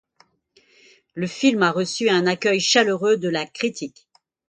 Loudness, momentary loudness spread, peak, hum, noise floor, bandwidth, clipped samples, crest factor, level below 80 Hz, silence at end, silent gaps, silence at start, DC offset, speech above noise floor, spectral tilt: -20 LUFS; 13 LU; -2 dBFS; none; -61 dBFS; 9.4 kHz; under 0.1%; 20 dB; -68 dBFS; 0.6 s; none; 1.15 s; under 0.1%; 40 dB; -3.5 dB/octave